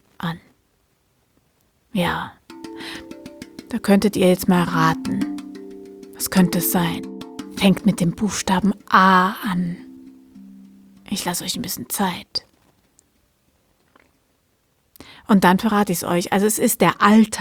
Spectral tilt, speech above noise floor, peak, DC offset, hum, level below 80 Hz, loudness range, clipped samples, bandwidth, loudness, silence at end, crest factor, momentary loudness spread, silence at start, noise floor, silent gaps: -5 dB/octave; 47 dB; 0 dBFS; under 0.1%; none; -52 dBFS; 11 LU; under 0.1%; over 20 kHz; -19 LUFS; 0 s; 20 dB; 22 LU; 0.2 s; -65 dBFS; none